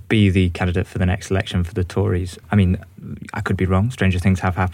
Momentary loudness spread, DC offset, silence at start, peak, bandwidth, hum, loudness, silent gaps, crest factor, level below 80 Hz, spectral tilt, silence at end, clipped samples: 9 LU; under 0.1%; 0.1 s; -6 dBFS; 11 kHz; none; -20 LUFS; none; 14 dB; -38 dBFS; -7 dB/octave; 0 s; under 0.1%